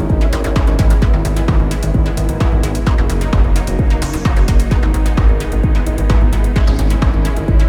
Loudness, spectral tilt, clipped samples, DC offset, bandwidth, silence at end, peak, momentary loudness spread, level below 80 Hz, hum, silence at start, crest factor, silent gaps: -15 LUFS; -7 dB/octave; under 0.1%; under 0.1%; 13 kHz; 0 s; -2 dBFS; 3 LU; -12 dBFS; none; 0 s; 10 dB; none